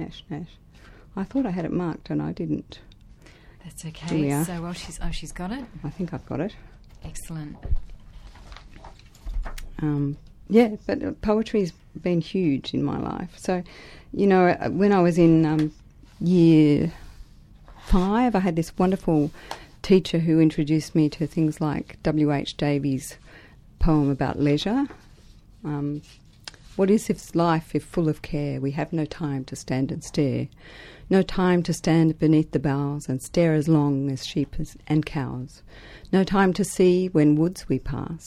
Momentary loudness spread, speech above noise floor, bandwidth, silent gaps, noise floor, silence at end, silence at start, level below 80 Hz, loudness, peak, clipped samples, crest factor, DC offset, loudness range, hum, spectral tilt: 17 LU; 27 dB; 14 kHz; none; -50 dBFS; 0 s; 0 s; -38 dBFS; -23 LUFS; -4 dBFS; under 0.1%; 18 dB; under 0.1%; 9 LU; none; -7 dB/octave